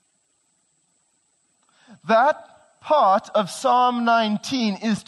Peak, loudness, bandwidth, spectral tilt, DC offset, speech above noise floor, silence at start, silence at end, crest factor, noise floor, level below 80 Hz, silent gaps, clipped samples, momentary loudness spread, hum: -8 dBFS; -20 LUFS; 12 kHz; -4.5 dB/octave; under 0.1%; 48 dB; 2.05 s; 0.05 s; 16 dB; -67 dBFS; -72 dBFS; none; under 0.1%; 8 LU; none